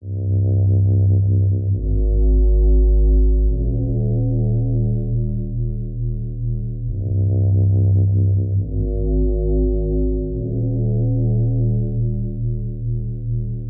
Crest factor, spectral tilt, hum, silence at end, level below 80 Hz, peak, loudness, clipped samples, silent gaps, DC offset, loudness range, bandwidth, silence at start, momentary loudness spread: 10 dB; -18.5 dB/octave; none; 0 s; -20 dBFS; -8 dBFS; -20 LUFS; under 0.1%; none; under 0.1%; 4 LU; 0.9 kHz; 0 s; 9 LU